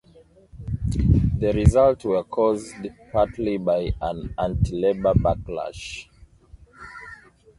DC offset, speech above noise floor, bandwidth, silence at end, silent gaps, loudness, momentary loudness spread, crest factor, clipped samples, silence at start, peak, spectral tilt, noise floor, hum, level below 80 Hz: under 0.1%; 31 dB; 11.5 kHz; 0.45 s; none; -22 LUFS; 20 LU; 22 dB; under 0.1%; 0.55 s; -2 dBFS; -8 dB/octave; -53 dBFS; none; -32 dBFS